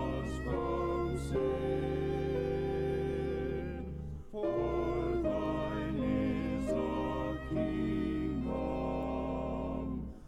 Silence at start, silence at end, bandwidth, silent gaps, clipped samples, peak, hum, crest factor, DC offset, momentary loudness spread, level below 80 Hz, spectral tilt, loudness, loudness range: 0 s; 0 s; 12.5 kHz; none; under 0.1%; -22 dBFS; none; 12 dB; under 0.1%; 4 LU; -44 dBFS; -8 dB/octave; -35 LUFS; 1 LU